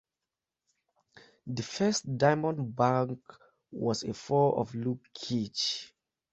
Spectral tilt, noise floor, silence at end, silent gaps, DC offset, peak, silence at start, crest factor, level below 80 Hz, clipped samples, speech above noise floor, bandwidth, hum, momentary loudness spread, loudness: -5 dB/octave; -90 dBFS; 0.45 s; none; under 0.1%; -10 dBFS; 1.15 s; 22 dB; -68 dBFS; under 0.1%; 60 dB; 8.4 kHz; none; 12 LU; -30 LUFS